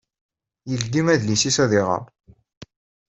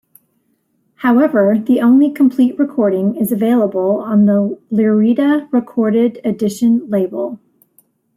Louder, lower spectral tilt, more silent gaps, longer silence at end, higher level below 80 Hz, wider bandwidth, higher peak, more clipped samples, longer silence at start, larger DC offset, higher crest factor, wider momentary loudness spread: second, -20 LUFS vs -14 LUFS; second, -4 dB/octave vs -7.5 dB/octave; first, 2.57-2.61 s vs none; second, 0.5 s vs 0.8 s; first, -56 dBFS vs -62 dBFS; second, 8.2 kHz vs 16 kHz; about the same, -4 dBFS vs -2 dBFS; neither; second, 0.65 s vs 1 s; neither; first, 20 dB vs 12 dB; first, 10 LU vs 7 LU